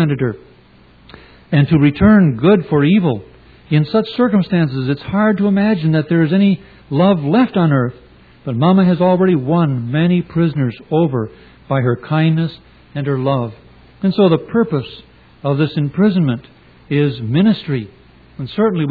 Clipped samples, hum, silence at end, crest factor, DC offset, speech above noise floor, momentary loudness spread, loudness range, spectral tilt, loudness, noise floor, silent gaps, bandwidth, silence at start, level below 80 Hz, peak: under 0.1%; none; 0 s; 14 dB; under 0.1%; 32 dB; 11 LU; 4 LU; -11 dB/octave; -15 LUFS; -47 dBFS; none; 4.9 kHz; 0 s; -44 dBFS; 0 dBFS